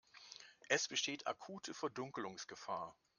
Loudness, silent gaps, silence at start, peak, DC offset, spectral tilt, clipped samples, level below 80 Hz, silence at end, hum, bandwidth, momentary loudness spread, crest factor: -42 LUFS; none; 0.15 s; -18 dBFS; under 0.1%; -2 dB/octave; under 0.1%; -86 dBFS; 0.25 s; none; 11 kHz; 18 LU; 26 dB